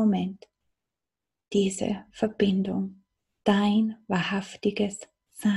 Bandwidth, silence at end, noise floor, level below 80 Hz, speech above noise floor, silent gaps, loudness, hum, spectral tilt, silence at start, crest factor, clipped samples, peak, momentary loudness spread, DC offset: 12 kHz; 0 s; -89 dBFS; -62 dBFS; 63 dB; none; -27 LUFS; none; -6 dB/octave; 0 s; 20 dB; under 0.1%; -8 dBFS; 11 LU; under 0.1%